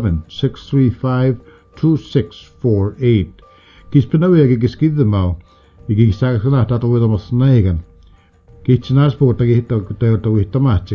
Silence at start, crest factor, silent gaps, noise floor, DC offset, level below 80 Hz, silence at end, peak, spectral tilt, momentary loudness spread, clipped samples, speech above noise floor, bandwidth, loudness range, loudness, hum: 0 s; 14 dB; none; -47 dBFS; under 0.1%; -32 dBFS; 0 s; 0 dBFS; -10 dB/octave; 9 LU; under 0.1%; 33 dB; 6.4 kHz; 2 LU; -15 LUFS; none